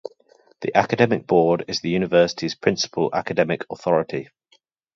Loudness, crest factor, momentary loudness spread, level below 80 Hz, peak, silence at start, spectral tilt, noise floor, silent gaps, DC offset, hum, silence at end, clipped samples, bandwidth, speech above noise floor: -21 LUFS; 20 dB; 8 LU; -58 dBFS; -2 dBFS; 0.6 s; -5 dB/octave; -62 dBFS; none; under 0.1%; none; 0.7 s; under 0.1%; 7.6 kHz; 42 dB